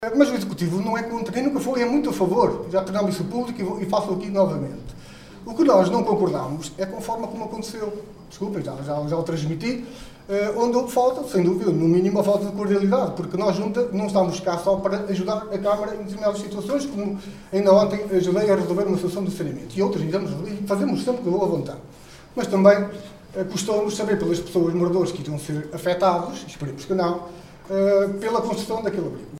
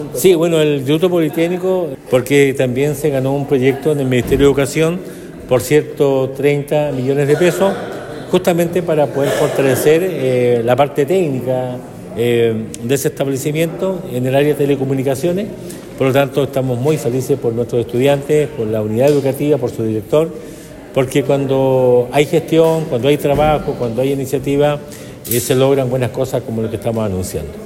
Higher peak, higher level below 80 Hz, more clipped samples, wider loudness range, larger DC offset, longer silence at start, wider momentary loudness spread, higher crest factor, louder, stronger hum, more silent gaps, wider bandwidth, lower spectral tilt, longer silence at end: about the same, -2 dBFS vs 0 dBFS; second, -52 dBFS vs -42 dBFS; neither; about the same, 4 LU vs 3 LU; neither; about the same, 0 s vs 0 s; first, 12 LU vs 8 LU; first, 20 dB vs 14 dB; second, -23 LUFS vs -15 LUFS; neither; neither; about the same, 15.5 kHz vs 16.5 kHz; about the same, -6.5 dB/octave vs -6 dB/octave; about the same, 0 s vs 0 s